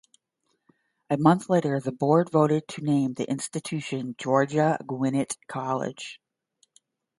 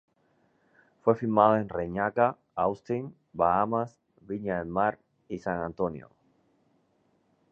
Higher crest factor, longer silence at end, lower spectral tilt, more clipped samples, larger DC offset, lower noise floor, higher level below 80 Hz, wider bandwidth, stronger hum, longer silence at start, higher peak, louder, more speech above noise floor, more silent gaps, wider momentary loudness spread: about the same, 22 dB vs 24 dB; second, 1.05 s vs 1.45 s; second, -6.5 dB/octave vs -9 dB/octave; neither; neither; first, -76 dBFS vs -70 dBFS; second, -70 dBFS vs -60 dBFS; first, 11.5 kHz vs 7.4 kHz; neither; about the same, 1.1 s vs 1.05 s; about the same, -4 dBFS vs -6 dBFS; first, -25 LUFS vs -28 LUFS; first, 51 dB vs 42 dB; neither; second, 10 LU vs 13 LU